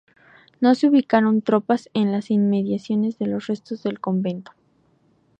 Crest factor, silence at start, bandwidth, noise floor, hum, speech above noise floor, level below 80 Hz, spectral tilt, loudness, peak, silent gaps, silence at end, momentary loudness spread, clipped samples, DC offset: 16 dB; 0.6 s; 8.2 kHz; -61 dBFS; none; 41 dB; -68 dBFS; -8 dB/octave; -21 LUFS; -6 dBFS; none; 1 s; 10 LU; under 0.1%; under 0.1%